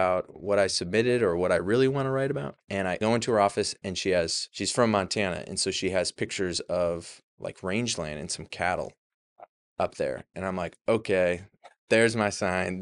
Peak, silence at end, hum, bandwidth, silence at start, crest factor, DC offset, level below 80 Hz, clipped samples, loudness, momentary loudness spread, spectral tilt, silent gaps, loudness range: -8 dBFS; 0 s; none; 11.5 kHz; 0 s; 20 dB; under 0.1%; -58 dBFS; under 0.1%; -27 LUFS; 10 LU; -4 dB/octave; 7.24-7.38 s, 8.98-9.36 s, 9.49-9.76 s, 11.78-11.88 s; 6 LU